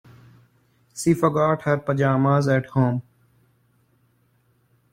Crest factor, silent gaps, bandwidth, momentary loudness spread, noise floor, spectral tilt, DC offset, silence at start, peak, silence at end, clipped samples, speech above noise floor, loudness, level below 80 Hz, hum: 18 dB; none; 15 kHz; 6 LU; -64 dBFS; -7 dB/octave; under 0.1%; 0.95 s; -6 dBFS; 1.9 s; under 0.1%; 43 dB; -21 LUFS; -60 dBFS; none